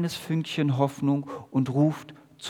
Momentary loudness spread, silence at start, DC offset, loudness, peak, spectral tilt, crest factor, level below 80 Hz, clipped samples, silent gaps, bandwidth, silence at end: 6 LU; 0 s; under 0.1%; -26 LUFS; -8 dBFS; -7 dB/octave; 18 dB; -70 dBFS; under 0.1%; none; 17 kHz; 0 s